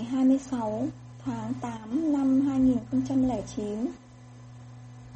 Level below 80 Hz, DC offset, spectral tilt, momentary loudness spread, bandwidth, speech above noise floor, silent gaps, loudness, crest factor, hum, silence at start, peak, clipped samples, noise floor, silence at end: -54 dBFS; under 0.1%; -7.5 dB/octave; 23 LU; 8.4 kHz; 21 dB; none; -28 LUFS; 14 dB; none; 0 s; -14 dBFS; under 0.1%; -48 dBFS; 0 s